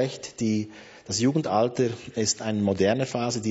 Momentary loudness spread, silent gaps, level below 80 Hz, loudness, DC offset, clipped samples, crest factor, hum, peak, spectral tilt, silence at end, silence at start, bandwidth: 7 LU; none; -62 dBFS; -26 LUFS; under 0.1%; under 0.1%; 16 dB; none; -10 dBFS; -4.5 dB/octave; 0 s; 0 s; 8 kHz